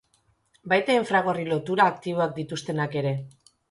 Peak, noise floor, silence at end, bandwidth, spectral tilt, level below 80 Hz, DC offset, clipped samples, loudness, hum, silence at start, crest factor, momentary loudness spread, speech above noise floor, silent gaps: -6 dBFS; -67 dBFS; 0.4 s; 11.5 kHz; -6 dB/octave; -66 dBFS; under 0.1%; under 0.1%; -25 LUFS; none; 0.65 s; 20 dB; 9 LU; 43 dB; none